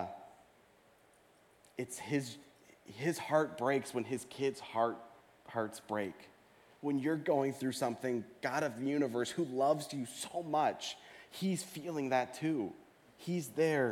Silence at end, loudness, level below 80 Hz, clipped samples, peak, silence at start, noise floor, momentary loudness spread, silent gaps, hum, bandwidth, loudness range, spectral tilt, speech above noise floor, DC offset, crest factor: 0 s; -36 LUFS; -82 dBFS; under 0.1%; -18 dBFS; 0 s; -66 dBFS; 13 LU; none; none; 17.5 kHz; 4 LU; -5 dB/octave; 31 dB; under 0.1%; 20 dB